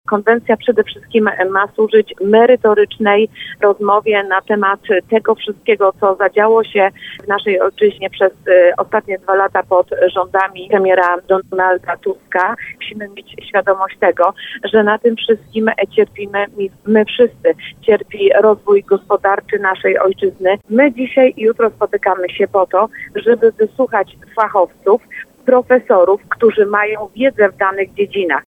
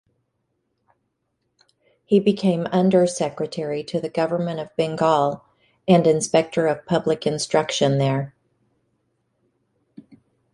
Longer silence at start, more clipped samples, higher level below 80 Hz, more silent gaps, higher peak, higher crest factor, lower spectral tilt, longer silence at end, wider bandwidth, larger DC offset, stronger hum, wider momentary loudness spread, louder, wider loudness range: second, 0.1 s vs 2.1 s; neither; first, -56 dBFS vs -62 dBFS; neither; about the same, 0 dBFS vs -2 dBFS; second, 14 dB vs 20 dB; about the same, -6.5 dB/octave vs -5.5 dB/octave; second, 0.05 s vs 2.25 s; second, 3.9 kHz vs 11.5 kHz; neither; neither; about the same, 7 LU vs 9 LU; first, -14 LUFS vs -21 LUFS; about the same, 3 LU vs 4 LU